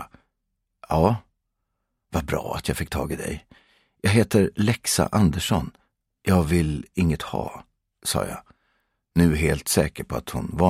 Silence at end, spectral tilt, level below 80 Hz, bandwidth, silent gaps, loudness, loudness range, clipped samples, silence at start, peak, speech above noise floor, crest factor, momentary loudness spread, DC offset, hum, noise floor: 0 s; -5.5 dB/octave; -40 dBFS; 16 kHz; none; -24 LUFS; 5 LU; under 0.1%; 0 s; -2 dBFS; 55 dB; 22 dB; 11 LU; under 0.1%; none; -78 dBFS